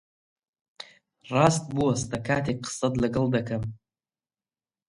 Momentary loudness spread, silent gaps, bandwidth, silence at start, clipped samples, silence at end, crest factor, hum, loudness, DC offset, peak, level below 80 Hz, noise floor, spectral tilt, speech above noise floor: 22 LU; none; 11.5 kHz; 0.8 s; under 0.1%; 1.1 s; 24 dB; none; -26 LUFS; under 0.1%; -4 dBFS; -54 dBFS; under -90 dBFS; -5.5 dB/octave; over 65 dB